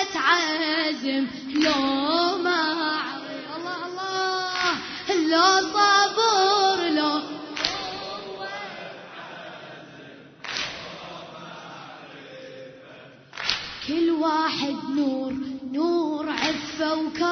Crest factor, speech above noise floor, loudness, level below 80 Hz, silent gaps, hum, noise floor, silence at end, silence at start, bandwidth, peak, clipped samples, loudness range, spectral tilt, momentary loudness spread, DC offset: 22 dB; 25 dB; -24 LUFS; -62 dBFS; none; none; -47 dBFS; 0 s; 0 s; 6.6 kHz; -4 dBFS; under 0.1%; 15 LU; -2.5 dB/octave; 21 LU; under 0.1%